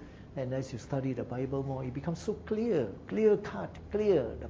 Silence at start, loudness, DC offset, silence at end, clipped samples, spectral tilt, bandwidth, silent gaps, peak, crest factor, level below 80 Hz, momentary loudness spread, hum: 0 s; -33 LUFS; under 0.1%; 0 s; under 0.1%; -8 dB/octave; 7.8 kHz; none; -14 dBFS; 18 dB; -52 dBFS; 10 LU; none